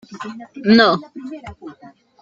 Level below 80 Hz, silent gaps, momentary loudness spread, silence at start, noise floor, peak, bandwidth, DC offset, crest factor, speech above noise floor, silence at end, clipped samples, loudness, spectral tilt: -56 dBFS; none; 24 LU; 0.1 s; -45 dBFS; -2 dBFS; 7.2 kHz; under 0.1%; 18 dB; 28 dB; 0.5 s; under 0.1%; -15 LUFS; -6 dB/octave